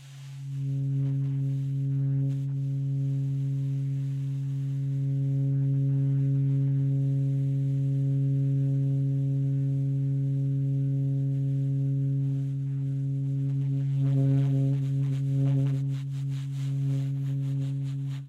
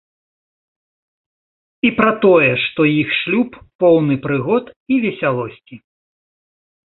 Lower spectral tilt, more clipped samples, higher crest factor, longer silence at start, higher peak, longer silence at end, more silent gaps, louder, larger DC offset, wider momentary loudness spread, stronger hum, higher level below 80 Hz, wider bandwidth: about the same, -10 dB/octave vs -10 dB/octave; neither; second, 10 dB vs 18 dB; second, 0 s vs 1.85 s; second, -16 dBFS vs 0 dBFS; second, 0 s vs 1.1 s; second, none vs 3.75-3.79 s, 4.76-4.86 s; second, -28 LUFS vs -16 LUFS; neither; second, 5 LU vs 8 LU; neither; second, -62 dBFS vs -56 dBFS; second, 3.9 kHz vs 4.3 kHz